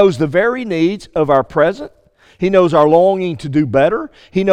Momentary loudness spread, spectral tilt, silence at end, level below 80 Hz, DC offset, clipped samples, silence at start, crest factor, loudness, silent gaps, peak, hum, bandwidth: 10 LU; -7.5 dB/octave; 0 s; -46 dBFS; under 0.1%; under 0.1%; 0 s; 14 dB; -14 LUFS; none; 0 dBFS; none; 10 kHz